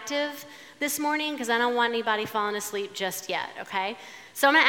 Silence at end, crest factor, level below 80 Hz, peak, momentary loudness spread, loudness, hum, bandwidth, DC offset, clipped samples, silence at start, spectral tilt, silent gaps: 0 s; 22 dB; -82 dBFS; -4 dBFS; 9 LU; -27 LUFS; none; 18 kHz; under 0.1%; under 0.1%; 0 s; -2 dB/octave; none